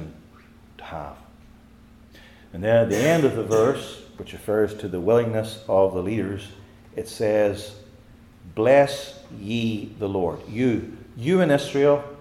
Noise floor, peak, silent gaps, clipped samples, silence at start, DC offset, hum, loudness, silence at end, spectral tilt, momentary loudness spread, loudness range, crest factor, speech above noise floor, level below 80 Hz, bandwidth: -50 dBFS; -4 dBFS; none; under 0.1%; 0 s; under 0.1%; none; -22 LUFS; 0 s; -6 dB/octave; 19 LU; 3 LU; 18 dB; 28 dB; -54 dBFS; 16.5 kHz